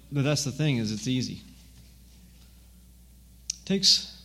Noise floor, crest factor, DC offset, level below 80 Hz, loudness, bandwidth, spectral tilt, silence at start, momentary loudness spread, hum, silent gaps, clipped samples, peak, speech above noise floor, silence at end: -53 dBFS; 22 dB; under 0.1%; -54 dBFS; -26 LUFS; 16 kHz; -3.5 dB/octave; 0.1 s; 16 LU; none; none; under 0.1%; -8 dBFS; 26 dB; 0 s